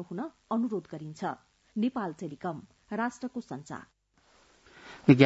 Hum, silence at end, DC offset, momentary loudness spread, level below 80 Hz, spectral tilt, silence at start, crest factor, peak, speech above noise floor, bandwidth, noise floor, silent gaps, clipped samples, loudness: none; 0 s; under 0.1%; 14 LU; -68 dBFS; -7.5 dB/octave; 0 s; 26 dB; -6 dBFS; 30 dB; 8 kHz; -65 dBFS; none; under 0.1%; -34 LUFS